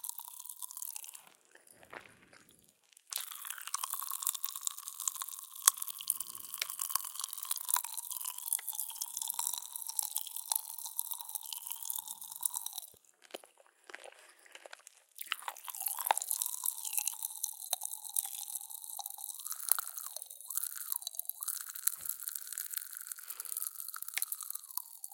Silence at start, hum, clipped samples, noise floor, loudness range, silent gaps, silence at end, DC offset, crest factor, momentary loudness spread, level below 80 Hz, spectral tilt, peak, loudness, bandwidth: 0.05 s; none; under 0.1%; -66 dBFS; 8 LU; none; 0 s; under 0.1%; 40 dB; 15 LU; under -90 dBFS; 3.5 dB/octave; -2 dBFS; -36 LUFS; 17 kHz